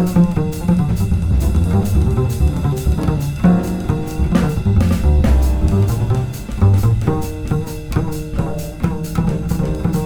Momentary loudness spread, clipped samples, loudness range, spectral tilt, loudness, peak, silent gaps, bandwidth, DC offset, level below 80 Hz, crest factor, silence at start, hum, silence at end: 7 LU; under 0.1%; 3 LU; -8 dB/octave; -17 LUFS; -2 dBFS; none; 19.5 kHz; under 0.1%; -20 dBFS; 12 dB; 0 s; none; 0 s